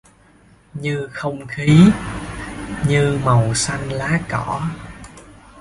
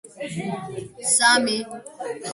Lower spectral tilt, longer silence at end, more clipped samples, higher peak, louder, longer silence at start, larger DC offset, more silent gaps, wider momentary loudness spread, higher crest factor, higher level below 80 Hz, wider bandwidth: first, -6 dB/octave vs -1.5 dB/octave; about the same, 0 s vs 0 s; neither; first, 0 dBFS vs -4 dBFS; about the same, -18 LUFS vs -20 LUFS; first, 0.75 s vs 0.05 s; neither; neither; about the same, 18 LU vs 19 LU; about the same, 18 dB vs 20 dB; first, -40 dBFS vs -64 dBFS; about the same, 11.5 kHz vs 12 kHz